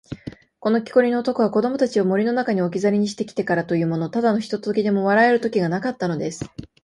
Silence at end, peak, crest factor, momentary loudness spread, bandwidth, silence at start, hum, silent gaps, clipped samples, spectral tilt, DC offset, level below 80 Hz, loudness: 0.2 s; -4 dBFS; 16 dB; 10 LU; 11.5 kHz; 0.1 s; none; none; under 0.1%; -6.5 dB/octave; under 0.1%; -58 dBFS; -21 LUFS